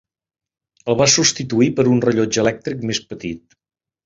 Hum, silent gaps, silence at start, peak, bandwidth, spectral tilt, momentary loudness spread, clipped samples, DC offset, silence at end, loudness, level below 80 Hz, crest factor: none; none; 0.85 s; 0 dBFS; 7.8 kHz; -4 dB/octave; 16 LU; under 0.1%; under 0.1%; 0.7 s; -17 LUFS; -52 dBFS; 18 dB